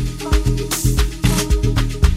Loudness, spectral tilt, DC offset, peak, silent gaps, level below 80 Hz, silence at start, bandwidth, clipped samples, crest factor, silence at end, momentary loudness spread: -18 LUFS; -5 dB/octave; under 0.1%; 0 dBFS; none; -18 dBFS; 0 s; 16.5 kHz; under 0.1%; 16 dB; 0 s; 2 LU